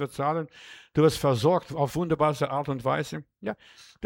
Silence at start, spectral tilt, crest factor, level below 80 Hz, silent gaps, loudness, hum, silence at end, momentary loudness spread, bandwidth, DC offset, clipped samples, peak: 0 s; -6.5 dB/octave; 18 dB; -56 dBFS; none; -27 LUFS; none; 0 s; 14 LU; 17 kHz; under 0.1%; under 0.1%; -8 dBFS